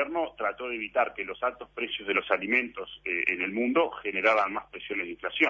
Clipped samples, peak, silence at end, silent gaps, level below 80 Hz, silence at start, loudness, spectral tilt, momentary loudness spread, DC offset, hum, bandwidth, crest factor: under 0.1%; -8 dBFS; 0 s; none; -64 dBFS; 0 s; -28 LUFS; -5 dB/octave; 9 LU; under 0.1%; none; 7.8 kHz; 20 dB